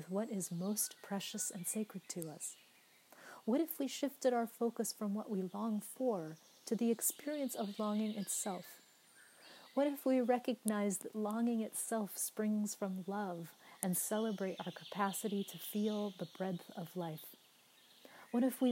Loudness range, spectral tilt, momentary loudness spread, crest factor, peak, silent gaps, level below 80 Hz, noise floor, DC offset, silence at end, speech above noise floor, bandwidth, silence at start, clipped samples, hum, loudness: 4 LU; -4.5 dB/octave; 11 LU; 26 dB; -14 dBFS; none; under -90 dBFS; -67 dBFS; under 0.1%; 0 s; 28 dB; 16 kHz; 0 s; under 0.1%; none; -39 LUFS